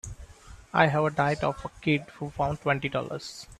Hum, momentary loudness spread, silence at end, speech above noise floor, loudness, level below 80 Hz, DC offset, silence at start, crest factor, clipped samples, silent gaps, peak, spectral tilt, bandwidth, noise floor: none; 14 LU; 0.05 s; 21 dB; -27 LUFS; -50 dBFS; under 0.1%; 0.05 s; 22 dB; under 0.1%; none; -6 dBFS; -6 dB/octave; 13 kHz; -48 dBFS